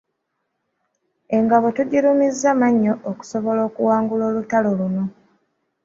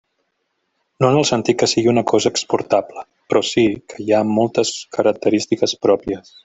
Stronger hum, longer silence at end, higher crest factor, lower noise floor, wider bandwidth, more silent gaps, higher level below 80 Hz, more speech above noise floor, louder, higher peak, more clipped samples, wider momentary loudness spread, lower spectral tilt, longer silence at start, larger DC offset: neither; first, 0.75 s vs 0.25 s; about the same, 18 dB vs 16 dB; first, -75 dBFS vs -71 dBFS; about the same, 7.8 kHz vs 8.4 kHz; neither; second, -62 dBFS vs -54 dBFS; about the same, 57 dB vs 54 dB; about the same, -19 LUFS vs -17 LUFS; about the same, -2 dBFS vs -2 dBFS; neither; first, 9 LU vs 5 LU; first, -7 dB/octave vs -4.5 dB/octave; first, 1.3 s vs 1 s; neither